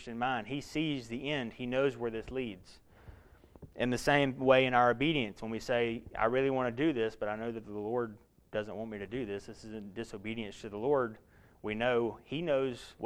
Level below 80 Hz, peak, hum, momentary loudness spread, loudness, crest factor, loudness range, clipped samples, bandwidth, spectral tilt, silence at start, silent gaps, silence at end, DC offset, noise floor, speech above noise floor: -58 dBFS; -12 dBFS; none; 14 LU; -33 LUFS; 22 dB; 9 LU; under 0.1%; 15 kHz; -5.5 dB/octave; 0 s; none; 0 s; under 0.1%; -57 dBFS; 25 dB